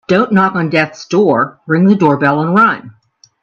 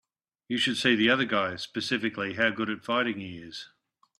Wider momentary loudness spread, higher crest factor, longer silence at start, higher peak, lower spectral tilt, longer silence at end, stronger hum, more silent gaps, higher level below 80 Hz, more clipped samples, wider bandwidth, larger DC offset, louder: second, 5 LU vs 16 LU; second, 12 dB vs 20 dB; second, 0.1 s vs 0.5 s; first, 0 dBFS vs -8 dBFS; first, -7.5 dB/octave vs -4 dB/octave; about the same, 0.55 s vs 0.5 s; neither; neither; first, -56 dBFS vs -68 dBFS; neither; second, 7.2 kHz vs 13 kHz; neither; first, -12 LUFS vs -27 LUFS